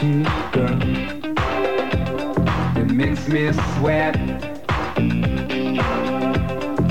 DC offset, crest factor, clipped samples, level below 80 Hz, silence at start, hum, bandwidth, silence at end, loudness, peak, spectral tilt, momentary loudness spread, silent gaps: 2%; 12 dB; under 0.1%; -34 dBFS; 0 s; none; 16 kHz; 0 s; -21 LUFS; -8 dBFS; -7.5 dB/octave; 5 LU; none